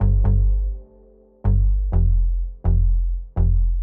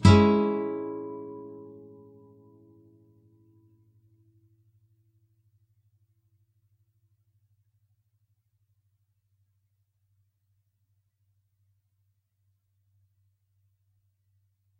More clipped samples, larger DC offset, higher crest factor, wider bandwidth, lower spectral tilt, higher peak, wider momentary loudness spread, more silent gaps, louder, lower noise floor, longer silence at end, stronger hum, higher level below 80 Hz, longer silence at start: neither; neither; second, 8 dB vs 28 dB; second, 1.6 kHz vs 9.6 kHz; first, -13.5 dB/octave vs -7.5 dB/octave; second, -8 dBFS vs -4 dBFS; second, 8 LU vs 29 LU; neither; first, -22 LUFS vs -25 LUFS; second, -50 dBFS vs -74 dBFS; second, 0 s vs 13.15 s; neither; first, -18 dBFS vs -56 dBFS; about the same, 0 s vs 0 s